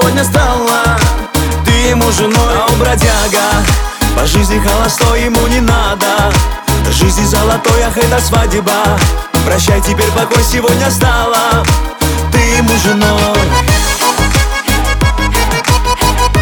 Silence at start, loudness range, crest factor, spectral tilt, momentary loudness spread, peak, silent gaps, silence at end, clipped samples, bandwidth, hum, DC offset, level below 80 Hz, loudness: 0 s; 1 LU; 10 dB; -4 dB/octave; 3 LU; 0 dBFS; none; 0 s; under 0.1%; 19.5 kHz; none; under 0.1%; -16 dBFS; -10 LUFS